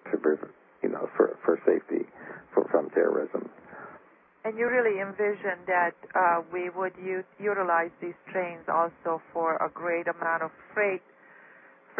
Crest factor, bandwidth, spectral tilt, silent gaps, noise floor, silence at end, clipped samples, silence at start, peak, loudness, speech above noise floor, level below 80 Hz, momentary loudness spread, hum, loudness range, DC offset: 20 dB; 3.4 kHz; -10 dB/octave; none; -56 dBFS; 0 s; under 0.1%; 0.05 s; -8 dBFS; -28 LUFS; 27 dB; -78 dBFS; 12 LU; none; 2 LU; under 0.1%